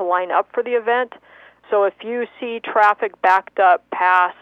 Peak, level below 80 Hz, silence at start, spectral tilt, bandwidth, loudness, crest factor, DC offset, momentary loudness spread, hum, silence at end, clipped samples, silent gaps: -4 dBFS; -74 dBFS; 0 s; -4 dB/octave; 8 kHz; -18 LUFS; 16 dB; under 0.1%; 10 LU; 60 Hz at -70 dBFS; 0.1 s; under 0.1%; none